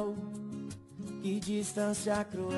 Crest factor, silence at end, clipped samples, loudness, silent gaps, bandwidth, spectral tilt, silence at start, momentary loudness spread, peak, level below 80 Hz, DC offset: 16 dB; 0 s; under 0.1%; -36 LUFS; none; 12 kHz; -5 dB/octave; 0 s; 11 LU; -20 dBFS; -66 dBFS; under 0.1%